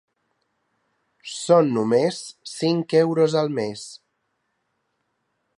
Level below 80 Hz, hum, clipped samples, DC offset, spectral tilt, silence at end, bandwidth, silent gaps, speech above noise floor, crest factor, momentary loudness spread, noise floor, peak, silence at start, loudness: -74 dBFS; none; under 0.1%; under 0.1%; -5.5 dB/octave; 1.6 s; 11.5 kHz; none; 53 dB; 20 dB; 17 LU; -74 dBFS; -4 dBFS; 1.25 s; -21 LUFS